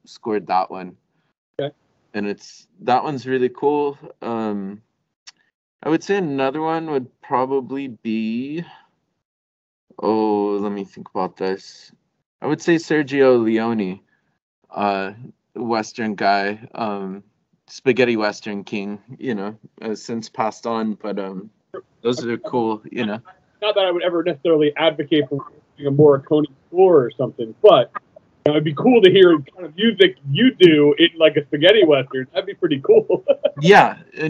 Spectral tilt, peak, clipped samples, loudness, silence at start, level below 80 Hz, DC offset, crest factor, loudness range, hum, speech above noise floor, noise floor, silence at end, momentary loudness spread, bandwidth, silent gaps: -6 dB/octave; 0 dBFS; under 0.1%; -18 LUFS; 0.1 s; -68 dBFS; under 0.1%; 20 dB; 10 LU; none; over 72 dB; under -90 dBFS; 0 s; 17 LU; 7.8 kHz; 1.38-1.54 s, 5.16-5.26 s, 5.54-5.79 s, 9.25-9.87 s, 12.26-12.39 s, 14.42-14.62 s